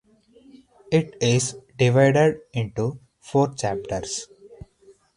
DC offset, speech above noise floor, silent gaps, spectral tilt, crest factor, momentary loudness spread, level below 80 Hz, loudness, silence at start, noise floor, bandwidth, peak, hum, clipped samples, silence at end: under 0.1%; 34 dB; none; -5.5 dB/octave; 18 dB; 13 LU; -54 dBFS; -23 LUFS; 0.9 s; -55 dBFS; 11 kHz; -4 dBFS; none; under 0.1%; 0.6 s